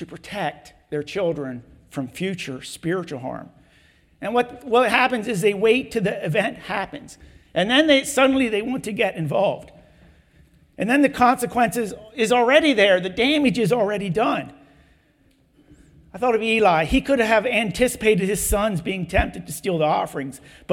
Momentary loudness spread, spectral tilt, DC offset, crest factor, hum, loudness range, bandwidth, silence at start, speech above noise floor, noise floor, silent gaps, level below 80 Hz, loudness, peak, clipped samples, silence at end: 15 LU; -4.5 dB/octave; under 0.1%; 20 dB; none; 8 LU; 18 kHz; 0 s; 39 dB; -60 dBFS; none; -42 dBFS; -21 LUFS; -2 dBFS; under 0.1%; 0 s